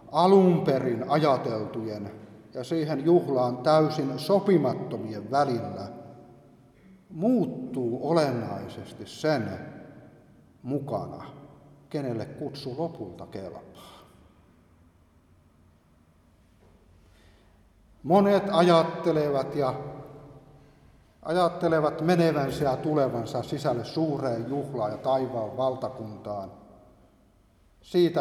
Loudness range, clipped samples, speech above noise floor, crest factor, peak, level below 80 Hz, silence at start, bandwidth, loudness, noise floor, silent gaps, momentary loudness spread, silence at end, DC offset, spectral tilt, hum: 11 LU; under 0.1%; 35 dB; 20 dB; -6 dBFS; -62 dBFS; 0 s; 14.5 kHz; -26 LUFS; -61 dBFS; none; 19 LU; 0 s; under 0.1%; -7.5 dB/octave; none